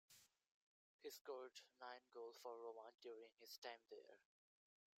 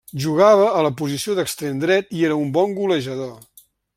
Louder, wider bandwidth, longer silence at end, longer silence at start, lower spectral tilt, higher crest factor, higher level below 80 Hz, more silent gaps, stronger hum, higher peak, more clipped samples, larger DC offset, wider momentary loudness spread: second, -59 LUFS vs -19 LUFS; about the same, 16 kHz vs 16 kHz; first, 0.75 s vs 0.6 s; about the same, 0.1 s vs 0.15 s; second, -1 dB/octave vs -5.5 dB/octave; about the same, 22 dB vs 18 dB; second, under -90 dBFS vs -62 dBFS; first, 0.51-0.99 s, 1.21-1.25 s, 3.58-3.62 s vs none; neither; second, -38 dBFS vs -2 dBFS; neither; neither; second, 6 LU vs 11 LU